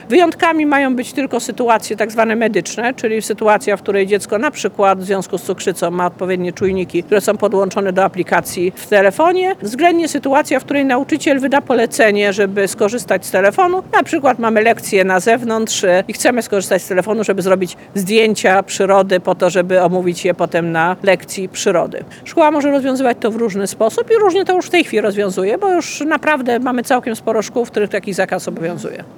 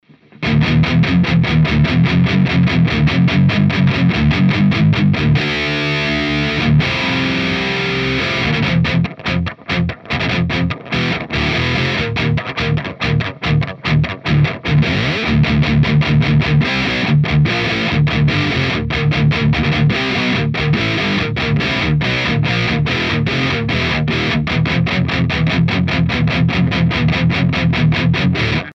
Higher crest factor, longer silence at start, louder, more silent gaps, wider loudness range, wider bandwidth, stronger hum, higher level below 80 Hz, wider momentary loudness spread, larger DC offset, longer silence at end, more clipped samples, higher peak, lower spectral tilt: about the same, 14 dB vs 12 dB; second, 0 s vs 0.4 s; about the same, -15 LUFS vs -15 LUFS; neither; about the same, 3 LU vs 4 LU; first, 19.5 kHz vs 7.4 kHz; neither; second, -58 dBFS vs -30 dBFS; about the same, 6 LU vs 4 LU; neither; about the same, 0.05 s vs 0 s; neither; about the same, 0 dBFS vs -2 dBFS; second, -4.5 dB/octave vs -7 dB/octave